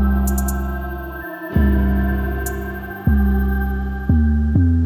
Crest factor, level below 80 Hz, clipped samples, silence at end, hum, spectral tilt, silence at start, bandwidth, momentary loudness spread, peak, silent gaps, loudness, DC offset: 14 dB; -20 dBFS; under 0.1%; 0 s; none; -7.5 dB/octave; 0 s; 17 kHz; 11 LU; -4 dBFS; none; -20 LUFS; 0.2%